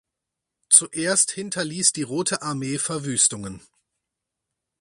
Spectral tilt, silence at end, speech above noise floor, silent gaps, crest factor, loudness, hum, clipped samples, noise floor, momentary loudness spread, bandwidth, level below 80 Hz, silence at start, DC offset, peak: -2 dB/octave; 1.2 s; 61 dB; none; 24 dB; -20 LUFS; none; under 0.1%; -84 dBFS; 12 LU; 12 kHz; -62 dBFS; 0.7 s; under 0.1%; 0 dBFS